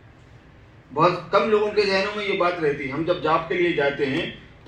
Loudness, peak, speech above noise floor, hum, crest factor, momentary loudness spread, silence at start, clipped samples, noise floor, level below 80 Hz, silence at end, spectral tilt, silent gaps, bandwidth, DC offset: -22 LUFS; -6 dBFS; 27 dB; none; 18 dB; 6 LU; 0.9 s; under 0.1%; -49 dBFS; -54 dBFS; 0.25 s; -6 dB/octave; none; 9 kHz; under 0.1%